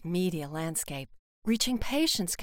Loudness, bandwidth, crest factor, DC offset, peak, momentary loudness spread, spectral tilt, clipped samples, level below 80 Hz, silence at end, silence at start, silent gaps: -30 LUFS; 17 kHz; 16 dB; under 0.1%; -14 dBFS; 11 LU; -3.5 dB/octave; under 0.1%; -48 dBFS; 0 s; 0 s; 1.19-1.42 s